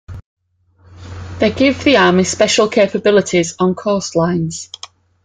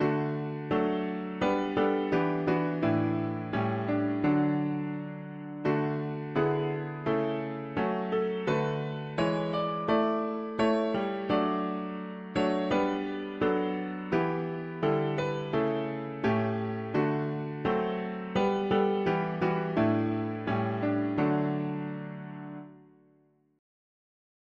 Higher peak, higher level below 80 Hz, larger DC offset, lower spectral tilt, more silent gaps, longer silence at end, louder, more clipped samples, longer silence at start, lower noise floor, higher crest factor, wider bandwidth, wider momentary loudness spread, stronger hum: first, 0 dBFS vs -12 dBFS; first, -48 dBFS vs -62 dBFS; neither; second, -4.5 dB/octave vs -8 dB/octave; first, 0.24-0.37 s vs none; second, 0.6 s vs 1.75 s; first, -14 LUFS vs -30 LUFS; neither; about the same, 0.1 s vs 0 s; second, -53 dBFS vs -66 dBFS; about the same, 16 dB vs 18 dB; first, 9.6 kHz vs 7.8 kHz; first, 20 LU vs 7 LU; neither